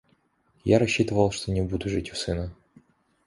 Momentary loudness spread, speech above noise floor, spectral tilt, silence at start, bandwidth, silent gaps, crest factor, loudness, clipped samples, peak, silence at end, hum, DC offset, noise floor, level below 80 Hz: 11 LU; 42 dB; -5.5 dB/octave; 0.65 s; 11.5 kHz; none; 22 dB; -26 LUFS; under 0.1%; -6 dBFS; 0.75 s; none; under 0.1%; -67 dBFS; -44 dBFS